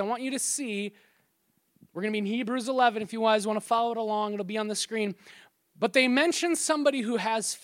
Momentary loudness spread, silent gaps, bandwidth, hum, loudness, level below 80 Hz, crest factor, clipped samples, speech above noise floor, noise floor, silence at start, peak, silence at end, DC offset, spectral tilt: 9 LU; none; 16.5 kHz; none; -27 LUFS; -82 dBFS; 20 dB; under 0.1%; 45 dB; -72 dBFS; 0 s; -8 dBFS; 0.05 s; under 0.1%; -3 dB/octave